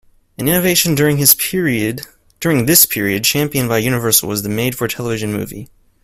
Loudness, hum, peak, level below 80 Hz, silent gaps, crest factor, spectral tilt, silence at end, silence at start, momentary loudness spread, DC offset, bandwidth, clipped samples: -14 LUFS; none; 0 dBFS; -46 dBFS; none; 16 dB; -3.5 dB/octave; 0.4 s; 0.4 s; 12 LU; under 0.1%; 16.5 kHz; under 0.1%